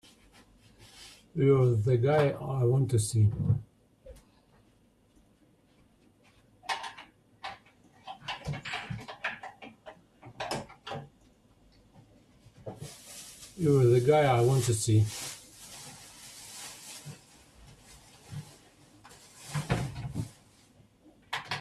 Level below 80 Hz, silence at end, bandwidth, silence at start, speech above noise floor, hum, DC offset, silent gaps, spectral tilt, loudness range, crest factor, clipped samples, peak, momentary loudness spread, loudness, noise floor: -58 dBFS; 0 s; 13.5 kHz; 1 s; 40 dB; none; under 0.1%; none; -6 dB/octave; 17 LU; 20 dB; under 0.1%; -12 dBFS; 24 LU; -29 LUFS; -65 dBFS